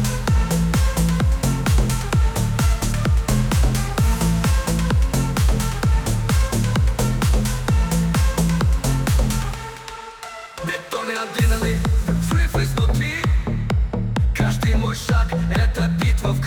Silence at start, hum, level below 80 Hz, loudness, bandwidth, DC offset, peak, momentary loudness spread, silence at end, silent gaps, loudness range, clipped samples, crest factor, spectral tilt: 0 s; none; -22 dBFS; -20 LUFS; 18.5 kHz; under 0.1%; -8 dBFS; 5 LU; 0 s; none; 3 LU; under 0.1%; 10 dB; -5.5 dB/octave